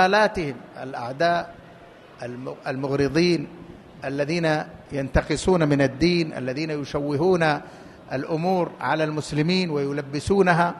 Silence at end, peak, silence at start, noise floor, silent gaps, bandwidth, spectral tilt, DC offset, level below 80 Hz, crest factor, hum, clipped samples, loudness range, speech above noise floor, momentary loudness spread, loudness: 0 s; -4 dBFS; 0 s; -46 dBFS; none; 12 kHz; -6 dB/octave; under 0.1%; -44 dBFS; 20 dB; none; under 0.1%; 3 LU; 24 dB; 15 LU; -23 LUFS